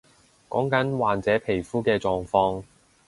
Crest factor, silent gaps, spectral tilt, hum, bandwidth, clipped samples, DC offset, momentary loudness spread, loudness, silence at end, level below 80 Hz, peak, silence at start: 18 dB; none; -6.5 dB/octave; none; 11.5 kHz; under 0.1%; under 0.1%; 5 LU; -24 LUFS; 0.45 s; -52 dBFS; -6 dBFS; 0.5 s